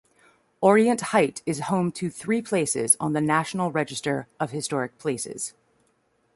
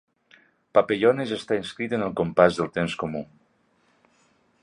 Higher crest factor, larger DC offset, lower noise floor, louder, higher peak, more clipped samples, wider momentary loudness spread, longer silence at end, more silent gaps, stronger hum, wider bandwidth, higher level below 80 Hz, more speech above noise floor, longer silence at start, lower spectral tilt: about the same, 20 dB vs 22 dB; neither; about the same, -68 dBFS vs -65 dBFS; about the same, -24 LUFS vs -24 LUFS; about the same, -4 dBFS vs -2 dBFS; neither; about the same, 10 LU vs 11 LU; second, 0.85 s vs 1.4 s; neither; neither; about the same, 12 kHz vs 11 kHz; second, -66 dBFS vs -58 dBFS; about the same, 44 dB vs 42 dB; second, 0.6 s vs 0.75 s; second, -4.5 dB/octave vs -6 dB/octave